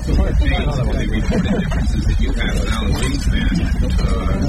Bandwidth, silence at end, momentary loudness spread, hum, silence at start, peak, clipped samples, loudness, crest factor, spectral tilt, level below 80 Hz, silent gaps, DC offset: 12.5 kHz; 0 s; 2 LU; none; 0 s; -4 dBFS; under 0.1%; -19 LUFS; 12 dB; -6 dB/octave; -18 dBFS; none; under 0.1%